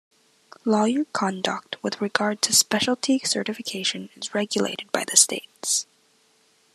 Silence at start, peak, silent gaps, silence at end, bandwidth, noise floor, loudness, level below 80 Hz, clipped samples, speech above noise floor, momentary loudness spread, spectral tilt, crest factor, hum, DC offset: 0.65 s; 0 dBFS; none; 0.9 s; 14 kHz; -62 dBFS; -23 LUFS; -74 dBFS; under 0.1%; 38 dB; 12 LU; -2 dB/octave; 24 dB; none; under 0.1%